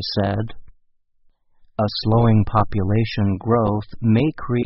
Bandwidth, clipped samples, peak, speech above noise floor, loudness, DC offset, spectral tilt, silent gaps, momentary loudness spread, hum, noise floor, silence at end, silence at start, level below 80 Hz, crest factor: 5.8 kHz; under 0.1%; -2 dBFS; 40 dB; -20 LUFS; under 0.1%; -6.5 dB/octave; none; 8 LU; none; -59 dBFS; 0 s; 0 s; -40 dBFS; 18 dB